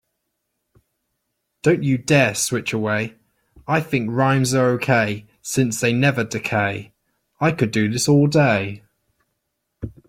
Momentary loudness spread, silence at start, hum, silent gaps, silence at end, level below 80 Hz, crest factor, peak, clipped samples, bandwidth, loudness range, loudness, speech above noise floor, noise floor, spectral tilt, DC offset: 14 LU; 1.65 s; none; none; 0.2 s; -54 dBFS; 18 dB; -2 dBFS; under 0.1%; 16 kHz; 2 LU; -19 LUFS; 57 dB; -76 dBFS; -5 dB/octave; under 0.1%